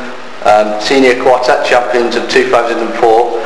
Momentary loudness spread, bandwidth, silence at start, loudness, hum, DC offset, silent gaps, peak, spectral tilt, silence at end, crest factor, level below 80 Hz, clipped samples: 4 LU; 11 kHz; 0 s; -10 LUFS; none; 6%; none; 0 dBFS; -3.5 dB/octave; 0 s; 10 dB; -46 dBFS; 0.5%